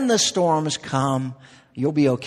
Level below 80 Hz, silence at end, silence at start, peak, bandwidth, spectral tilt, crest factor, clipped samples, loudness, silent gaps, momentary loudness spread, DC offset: -60 dBFS; 0 s; 0 s; -6 dBFS; 13 kHz; -4.5 dB/octave; 16 dB; under 0.1%; -21 LUFS; none; 10 LU; under 0.1%